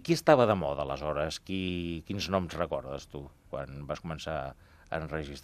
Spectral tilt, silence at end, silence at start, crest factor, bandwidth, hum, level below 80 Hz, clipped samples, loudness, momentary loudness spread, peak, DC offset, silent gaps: -5.5 dB/octave; 0 s; 0 s; 24 dB; 14.5 kHz; none; -52 dBFS; under 0.1%; -31 LUFS; 17 LU; -6 dBFS; under 0.1%; none